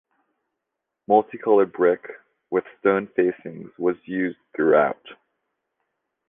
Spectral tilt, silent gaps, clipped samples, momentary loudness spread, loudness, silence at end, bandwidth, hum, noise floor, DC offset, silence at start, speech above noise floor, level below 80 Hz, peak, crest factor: -10 dB/octave; none; under 0.1%; 10 LU; -22 LUFS; 1.15 s; 3.7 kHz; none; -82 dBFS; under 0.1%; 1.1 s; 61 dB; -68 dBFS; -4 dBFS; 20 dB